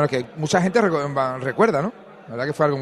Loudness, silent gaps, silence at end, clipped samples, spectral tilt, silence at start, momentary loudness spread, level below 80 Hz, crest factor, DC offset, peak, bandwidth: -21 LUFS; none; 0 s; under 0.1%; -6 dB/octave; 0 s; 9 LU; -60 dBFS; 16 dB; under 0.1%; -4 dBFS; 12.5 kHz